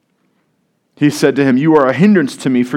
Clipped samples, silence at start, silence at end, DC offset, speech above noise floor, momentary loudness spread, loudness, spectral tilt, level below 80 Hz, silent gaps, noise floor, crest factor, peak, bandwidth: under 0.1%; 1 s; 0 s; under 0.1%; 52 dB; 6 LU; -12 LUFS; -6.5 dB/octave; -60 dBFS; none; -63 dBFS; 14 dB; 0 dBFS; 15.5 kHz